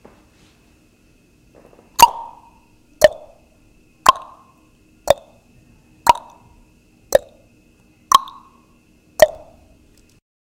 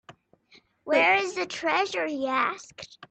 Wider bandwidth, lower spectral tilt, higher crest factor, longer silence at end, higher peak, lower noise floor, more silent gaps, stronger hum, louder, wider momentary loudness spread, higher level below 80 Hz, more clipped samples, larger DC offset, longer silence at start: first, 16.5 kHz vs 9 kHz; about the same, -1.5 dB/octave vs -2.5 dB/octave; about the same, 22 dB vs 18 dB; first, 1.15 s vs 0.05 s; first, 0 dBFS vs -10 dBFS; second, -54 dBFS vs -60 dBFS; neither; neither; first, -17 LUFS vs -25 LUFS; about the same, 21 LU vs 22 LU; first, -48 dBFS vs -74 dBFS; first, 0.2% vs under 0.1%; neither; first, 2 s vs 0.1 s